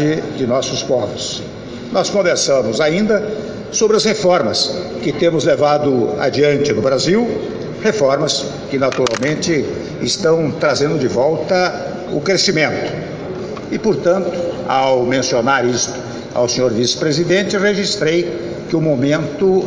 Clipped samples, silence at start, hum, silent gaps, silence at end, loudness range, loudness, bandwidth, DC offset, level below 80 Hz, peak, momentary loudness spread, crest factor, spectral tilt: under 0.1%; 0 s; none; none; 0 s; 2 LU; -16 LUFS; 8 kHz; under 0.1%; -48 dBFS; 0 dBFS; 9 LU; 16 dB; -4.5 dB/octave